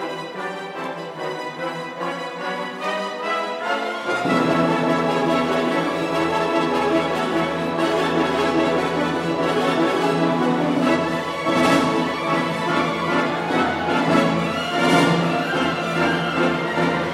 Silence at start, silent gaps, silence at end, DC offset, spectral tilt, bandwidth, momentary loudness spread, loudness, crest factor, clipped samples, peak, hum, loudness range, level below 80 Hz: 0 s; none; 0 s; under 0.1%; -5.5 dB/octave; 15.5 kHz; 10 LU; -21 LUFS; 16 dB; under 0.1%; -4 dBFS; none; 5 LU; -54 dBFS